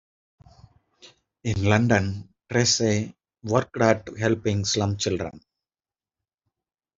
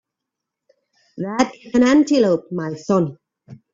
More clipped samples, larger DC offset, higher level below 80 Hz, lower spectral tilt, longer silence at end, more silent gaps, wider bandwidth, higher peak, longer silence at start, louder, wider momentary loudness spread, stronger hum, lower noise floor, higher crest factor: neither; neither; about the same, -56 dBFS vs -58 dBFS; second, -4.5 dB/octave vs -6 dB/octave; first, 1.6 s vs 0.2 s; neither; about the same, 7.8 kHz vs 7.8 kHz; about the same, -2 dBFS vs -2 dBFS; about the same, 1.05 s vs 1.15 s; second, -24 LUFS vs -18 LUFS; about the same, 14 LU vs 12 LU; neither; first, under -90 dBFS vs -83 dBFS; first, 24 dB vs 18 dB